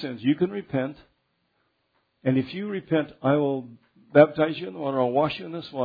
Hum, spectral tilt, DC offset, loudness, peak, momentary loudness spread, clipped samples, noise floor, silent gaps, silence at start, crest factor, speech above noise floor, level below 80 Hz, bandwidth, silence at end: none; -9.5 dB/octave; under 0.1%; -25 LUFS; -2 dBFS; 13 LU; under 0.1%; -72 dBFS; none; 0 s; 24 dB; 48 dB; -64 dBFS; 5 kHz; 0 s